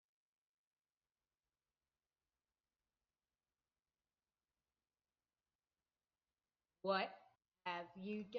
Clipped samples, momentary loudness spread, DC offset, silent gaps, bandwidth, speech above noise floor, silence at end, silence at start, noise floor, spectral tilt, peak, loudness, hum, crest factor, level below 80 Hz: under 0.1%; 10 LU; under 0.1%; none; 6 kHz; over 46 dB; 0 s; 6.85 s; under -90 dBFS; -2.5 dB/octave; -26 dBFS; -45 LUFS; none; 26 dB; under -90 dBFS